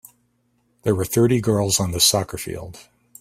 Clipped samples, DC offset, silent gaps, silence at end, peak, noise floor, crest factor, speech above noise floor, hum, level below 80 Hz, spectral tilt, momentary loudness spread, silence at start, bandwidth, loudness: under 0.1%; under 0.1%; none; 0.4 s; -2 dBFS; -66 dBFS; 20 dB; 46 dB; 60 Hz at -40 dBFS; -50 dBFS; -4 dB/octave; 15 LU; 0.85 s; 16 kHz; -19 LUFS